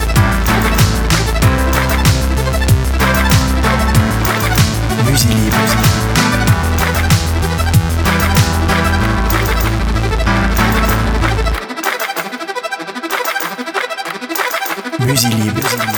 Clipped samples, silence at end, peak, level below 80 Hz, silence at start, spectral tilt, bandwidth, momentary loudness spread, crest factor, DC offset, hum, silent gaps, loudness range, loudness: under 0.1%; 0 s; 0 dBFS; -20 dBFS; 0 s; -4.5 dB/octave; over 20 kHz; 7 LU; 14 dB; under 0.1%; none; none; 5 LU; -14 LUFS